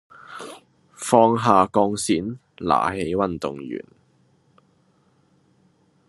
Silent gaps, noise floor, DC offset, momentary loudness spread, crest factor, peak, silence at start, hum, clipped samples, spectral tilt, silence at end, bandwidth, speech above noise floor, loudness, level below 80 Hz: none; -62 dBFS; under 0.1%; 21 LU; 22 dB; 0 dBFS; 0.3 s; none; under 0.1%; -5 dB/octave; 2.25 s; 12.5 kHz; 41 dB; -21 LUFS; -62 dBFS